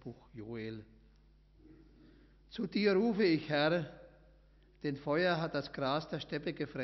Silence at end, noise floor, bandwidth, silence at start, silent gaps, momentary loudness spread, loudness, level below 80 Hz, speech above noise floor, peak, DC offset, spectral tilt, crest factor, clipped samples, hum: 0 s; -64 dBFS; 6.2 kHz; 0.05 s; none; 17 LU; -34 LUFS; -64 dBFS; 29 dB; -20 dBFS; under 0.1%; -4.5 dB/octave; 18 dB; under 0.1%; none